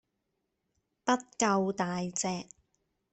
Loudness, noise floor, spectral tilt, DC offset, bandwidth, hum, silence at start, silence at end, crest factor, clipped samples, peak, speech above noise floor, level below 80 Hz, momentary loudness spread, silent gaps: -31 LUFS; -82 dBFS; -4 dB/octave; under 0.1%; 8.4 kHz; none; 1.05 s; 0.7 s; 22 dB; under 0.1%; -12 dBFS; 51 dB; -72 dBFS; 10 LU; none